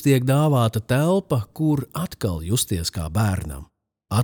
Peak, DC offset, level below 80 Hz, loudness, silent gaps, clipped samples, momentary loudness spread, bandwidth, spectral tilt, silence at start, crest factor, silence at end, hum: -6 dBFS; under 0.1%; -44 dBFS; -22 LUFS; none; under 0.1%; 10 LU; over 20 kHz; -6 dB/octave; 0 s; 16 dB; 0 s; none